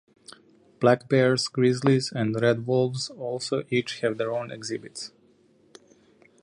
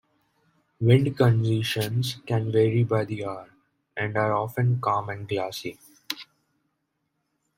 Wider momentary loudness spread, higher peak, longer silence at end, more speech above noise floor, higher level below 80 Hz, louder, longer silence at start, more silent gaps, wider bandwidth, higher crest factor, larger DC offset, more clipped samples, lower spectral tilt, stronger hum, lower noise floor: about the same, 13 LU vs 14 LU; about the same, -6 dBFS vs -4 dBFS; about the same, 1.35 s vs 1.35 s; second, 36 dB vs 53 dB; second, -68 dBFS vs -60 dBFS; about the same, -25 LUFS vs -25 LUFS; about the same, 0.8 s vs 0.8 s; neither; second, 11 kHz vs 16.5 kHz; about the same, 20 dB vs 22 dB; neither; neither; about the same, -5.5 dB/octave vs -6.5 dB/octave; neither; second, -60 dBFS vs -77 dBFS